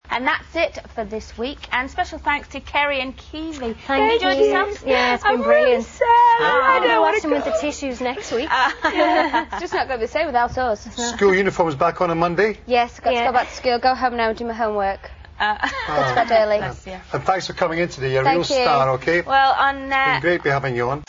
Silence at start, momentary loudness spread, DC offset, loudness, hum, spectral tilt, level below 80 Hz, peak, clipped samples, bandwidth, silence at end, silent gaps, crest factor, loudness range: 0.05 s; 10 LU; under 0.1%; -19 LUFS; none; -4.5 dB/octave; -44 dBFS; -2 dBFS; under 0.1%; 7.6 kHz; 0.05 s; none; 16 dB; 5 LU